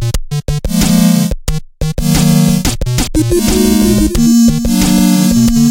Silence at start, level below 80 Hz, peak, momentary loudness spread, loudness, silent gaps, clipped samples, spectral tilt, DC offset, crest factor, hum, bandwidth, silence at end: 0 s; -20 dBFS; 0 dBFS; 9 LU; -11 LUFS; none; under 0.1%; -5.5 dB/octave; under 0.1%; 10 dB; none; 17 kHz; 0 s